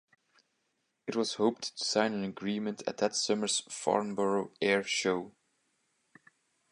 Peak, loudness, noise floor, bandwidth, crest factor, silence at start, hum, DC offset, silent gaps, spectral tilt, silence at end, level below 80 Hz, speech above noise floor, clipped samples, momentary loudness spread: -12 dBFS; -31 LUFS; -79 dBFS; 11.5 kHz; 22 dB; 1.05 s; none; under 0.1%; none; -3 dB/octave; 1.4 s; -76 dBFS; 48 dB; under 0.1%; 7 LU